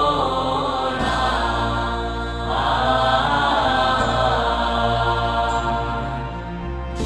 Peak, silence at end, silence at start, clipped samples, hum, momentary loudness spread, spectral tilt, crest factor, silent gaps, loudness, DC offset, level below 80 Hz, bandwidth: -6 dBFS; 0 s; 0 s; under 0.1%; none; 9 LU; -5 dB/octave; 14 dB; none; -20 LUFS; under 0.1%; -30 dBFS; 11 kHz